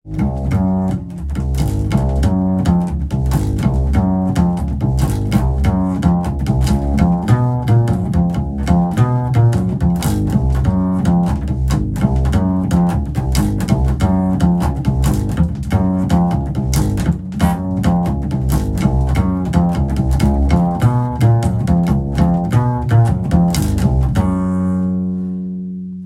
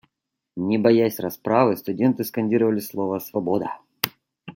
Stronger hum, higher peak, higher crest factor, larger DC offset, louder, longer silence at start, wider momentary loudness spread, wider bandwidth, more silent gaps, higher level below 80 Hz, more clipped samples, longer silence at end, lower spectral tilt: neither; about the same, 0 dBFS vs 0 dBFS; second, 14 dB vs 22 dB; neither; first, -16 LUFS vs -22 LUFS; second, 0.05 s vs 0.55 s; second, 4 LU vs 10 LU; about the same, 15.5 kHz vs 17 kHz; neither; first, -22 dBFS vs -66 dBFS; neither; about the same, 0 s vs 0.05 s; first, -8 dB/octave vs -6 dB/octave